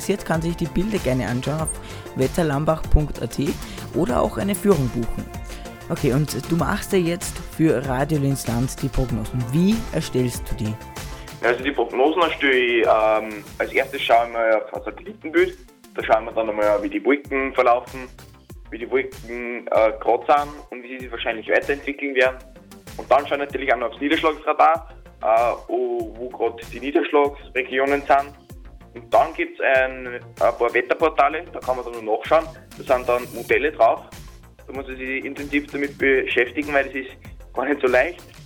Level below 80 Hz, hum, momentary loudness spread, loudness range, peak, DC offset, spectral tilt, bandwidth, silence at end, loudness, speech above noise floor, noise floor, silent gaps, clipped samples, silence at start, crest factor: -36 dBFS; none; 14 LU; 3 LU; 0 dBFS; under 0.1%; -5.5 dB/octave; over 20 kHz; 0 s; -21 LUFS; 20 dB; -41 dBFS; none; under 0.1%; 0 s; 22 dB